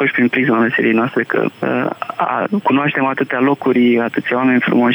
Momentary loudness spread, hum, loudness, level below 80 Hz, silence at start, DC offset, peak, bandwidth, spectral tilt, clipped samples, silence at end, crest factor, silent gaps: 5 LU; none; -15 LUFS; -70 dBFS; 0 s; under 0.1%; -4 dBFS; over 20 kHz; -8 dB/octave; under 0.1%; 0 s; 10 dB; none